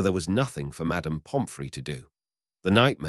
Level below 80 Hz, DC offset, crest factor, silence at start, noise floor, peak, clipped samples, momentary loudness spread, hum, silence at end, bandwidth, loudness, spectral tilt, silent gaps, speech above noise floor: -50 dBFS; under 0.1%; 20 dB; 0 s; under -90 dBFS; -6 dBFS; under 0.1%; 14 LU; none; 0 s; 12 kHz; -28 LUFS; -5.5 dB/octave; none; over 64 dB